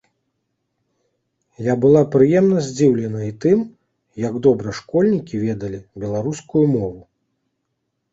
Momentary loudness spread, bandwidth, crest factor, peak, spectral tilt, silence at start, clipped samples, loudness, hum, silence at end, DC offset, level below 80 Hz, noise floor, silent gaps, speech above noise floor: 13 LU; 8 kHz; 18 dB; -2 dBFS; -7.5 dB/octave; 1.6 s; under 0.1%; -18 LUFS; none; 1.1 s; under 0.1%; -54 dBFS; -74 dBFS; none; 57 dB